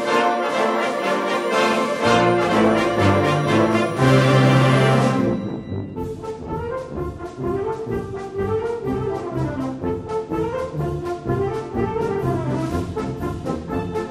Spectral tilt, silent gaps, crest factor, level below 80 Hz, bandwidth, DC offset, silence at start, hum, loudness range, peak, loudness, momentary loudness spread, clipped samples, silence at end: -6.5 dB/octave; none; 18 dB; -42 dBFS; 14 kHz; under 0.1%; 0 s; none; 9 LU; -2 dBFS; -21 LUFS; 12 LU; under 0.1%; 0 s